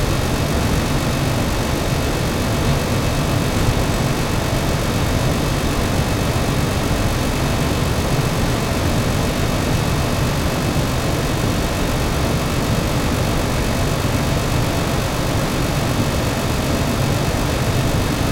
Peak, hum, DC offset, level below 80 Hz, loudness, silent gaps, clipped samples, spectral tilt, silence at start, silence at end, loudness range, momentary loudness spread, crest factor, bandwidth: -4 dBFS; none; under 0.1%; -26 dBFS; -19 LUFS; none; under 0.1%; -5 dB/octave; 0 s; 0 s; 0 LU; 1 LU; 14 dB; 17 kHz